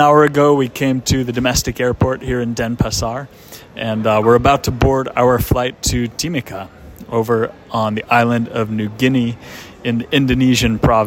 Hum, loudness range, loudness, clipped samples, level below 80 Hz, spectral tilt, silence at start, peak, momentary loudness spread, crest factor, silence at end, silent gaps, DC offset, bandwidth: none; 3 LU; -16 LUFS; under 0.1%; -32 dBFS; -5 dB/octave; 0 s; 0 dBFS; 11 LU; 16 dB; 0 s; none; under 0.1%; 16.5 kHz